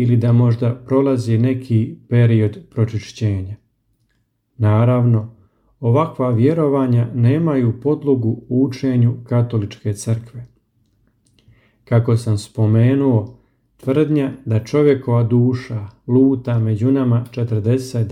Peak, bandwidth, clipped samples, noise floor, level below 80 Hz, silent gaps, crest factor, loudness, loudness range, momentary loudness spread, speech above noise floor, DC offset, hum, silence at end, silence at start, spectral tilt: -2 dBFS; 10.5 kHz; under 0.1%; -66 dBFS; -54 dBFS; none; 14 dB; -17 LUFS; 4 LU; 9 LU; 50 dB; under 0.1%; none; 0 s; 0 s; -9 dB/octave